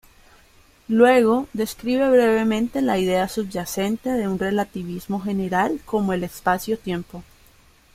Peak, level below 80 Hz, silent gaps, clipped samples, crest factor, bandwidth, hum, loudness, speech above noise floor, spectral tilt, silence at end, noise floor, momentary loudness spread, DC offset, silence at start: -2 dBFS; -50 dBFS; none; under 0.1%; 18 dB; 16 kHz; none; -21 LUFS; 33 dB; -5.5 dB/octave; 0.7 s; -54 dBFS; 11 LU; under 0.1%; 0.9 s